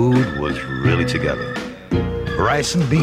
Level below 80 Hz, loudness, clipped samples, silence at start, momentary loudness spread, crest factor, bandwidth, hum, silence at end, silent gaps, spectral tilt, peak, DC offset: -36 dBFS; -20 LUFS; under 0.1%; 0 s; 6 LU; 14 dB; 14 kHz; none; 0 s; none; -6 dB/octave; -6 dBFS; under 0.1%